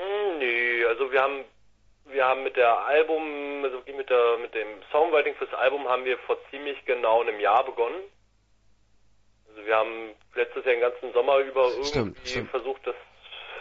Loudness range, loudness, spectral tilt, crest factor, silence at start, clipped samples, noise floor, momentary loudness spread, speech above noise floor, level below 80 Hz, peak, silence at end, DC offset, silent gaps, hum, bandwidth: 4 LU; -25 LUFS; -4.5 dB/octave; 18 dB; 0 s; under 0.1%; -63 dBFS; 12 LU; 38 dB; -58 dBFS; -8 dBFS; 0 s; under 0.1%; none; none; 7.6 kHz